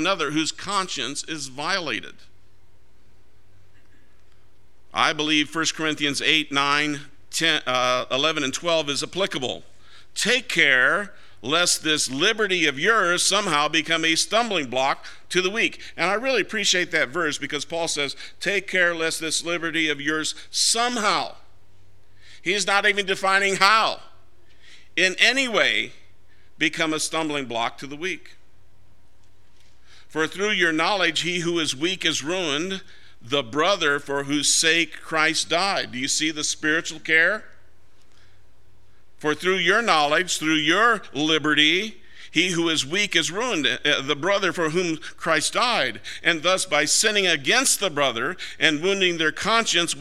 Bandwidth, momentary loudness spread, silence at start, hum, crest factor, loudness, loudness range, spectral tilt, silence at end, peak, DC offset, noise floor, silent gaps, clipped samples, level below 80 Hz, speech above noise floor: 16 kHz; 9 LU; 0 s; none; 24 dB; -21 LUFS; 7 LU; -2 dB/octave; 0 s; 0 dBFS; 1%; -59 dBFS; none; under 0.1%; -62 dBFS; 37 dB